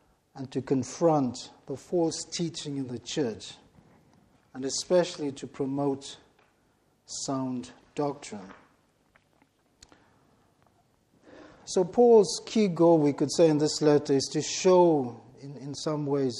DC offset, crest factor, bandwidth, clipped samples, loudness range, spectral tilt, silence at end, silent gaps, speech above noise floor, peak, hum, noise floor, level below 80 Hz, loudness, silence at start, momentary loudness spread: under 0.1%; 18 dB; 11.5 kHz; under 0.1%; 14 LU; -5 dB/octave; 0 s; none; 42 dB; -10 dBFS; none; -68 dBFS; -68 dBFS; -26 LUFS; 0.35 s; 20 LU